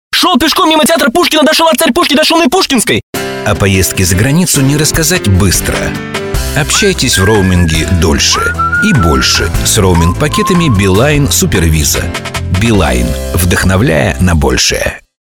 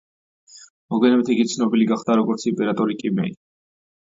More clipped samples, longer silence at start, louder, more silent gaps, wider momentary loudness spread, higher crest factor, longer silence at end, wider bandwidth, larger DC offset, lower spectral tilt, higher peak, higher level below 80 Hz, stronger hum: neither; second, 0.1 s vs 0.55 s; first, -9 LUFS vs -20 LUFS; second, 3.03-3.13 s vs 0.70-0.89 s; about the same, 7 LU vs 7 LU; second, 10 dB vs 16 dB; second, 0.25 s vs 0.8 s; first, 19 kHz vs 7.8 kHz; neither; second, -4 dB/octave vs -6 dB/octave; first, 0 dBFS vs -4 dBFS; first, -22 dBFS vs -66 dBFS; neither